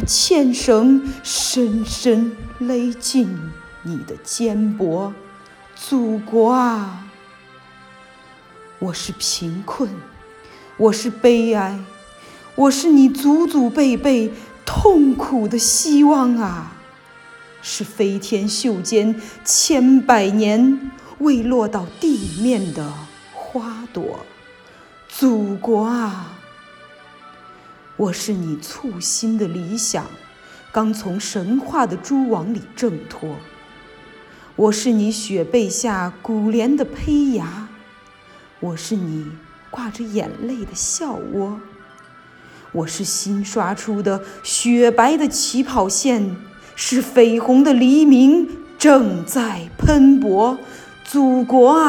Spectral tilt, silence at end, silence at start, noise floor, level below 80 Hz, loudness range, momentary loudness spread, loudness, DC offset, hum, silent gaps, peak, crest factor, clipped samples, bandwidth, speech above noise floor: -4 dB/octave; 0 s; 0 s; -45 dBFS; -42 dBFS; 10 LU; 17 LU; -17 LUFS; under 0.1%; none; none; 0 dBFS; 18 dB; under 0.1%; 17.5 kHz; 29 dB